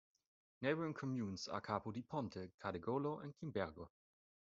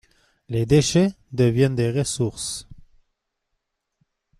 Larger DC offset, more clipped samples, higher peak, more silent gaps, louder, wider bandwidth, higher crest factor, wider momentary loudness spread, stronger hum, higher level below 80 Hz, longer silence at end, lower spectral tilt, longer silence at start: neither; neither; second, -24 dBFS vs -6 dBFS; first, 2.54-2.58 s vs none; second, -44 LUFS vs -21 LUFS; second, 7.6 kHz vs 13.5 kHz; about the same, 22 dB vs 18 dB; second, 7 LU vs 12 LU; neither; second, -76 dBFS vs -50 dBFS; second, 0.55 s vs 1.65 s; about the same, -5.5 dB/octave vs -5.5 dB/octave; about the same, 0.6 s vs 0.5 s